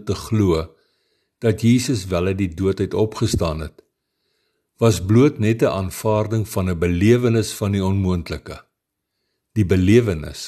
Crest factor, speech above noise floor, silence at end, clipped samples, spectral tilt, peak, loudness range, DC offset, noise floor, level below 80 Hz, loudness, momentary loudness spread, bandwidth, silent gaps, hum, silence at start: 18 dB; 59 dB; 0 s; under 0.1%; -6.5 dB/octave; -2 dBFS; 3 LU; under 0.1%; -78 dBFS; -40 dBFS; -19 LUFS; 10 LU; 13 kHz; none; none; 0.05 s